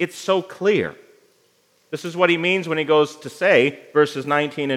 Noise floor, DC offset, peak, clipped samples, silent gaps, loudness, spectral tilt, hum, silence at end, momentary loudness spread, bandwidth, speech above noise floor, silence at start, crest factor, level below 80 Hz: -61 dBFS; under 0.1%; -2 dBFS; under 0.1%; none; -20 LUFS; -5 dB/octave; none; 0 s; 10 LU; 14.5 kHz; 41 dB; 0 s; 20 dB; -72 dBFS